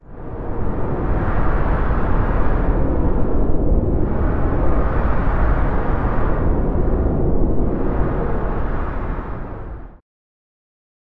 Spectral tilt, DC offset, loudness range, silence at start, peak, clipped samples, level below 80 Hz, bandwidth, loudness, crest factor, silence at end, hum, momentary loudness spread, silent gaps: -11 dB/octave; under 0.1%; 3 LU; 0.05 s; -4 dBFS; under 0.1%; -20 dBFS; 3.7 kHz; -21 LUFS; 12 dB; 1.05 s; none; 8 LU; none